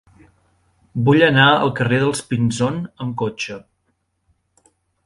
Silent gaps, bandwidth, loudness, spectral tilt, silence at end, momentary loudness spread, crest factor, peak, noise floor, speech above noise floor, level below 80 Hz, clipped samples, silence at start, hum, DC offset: none; 11.5 kHz; -17 LUFS; -5.5 dB/octave; 1.45 s; 16 LU; 20 dB; 0 dBFS; -69 dBFS; 52 dB; -54 dBFS; under 0.1%; 0.95 s; none; under 0.1%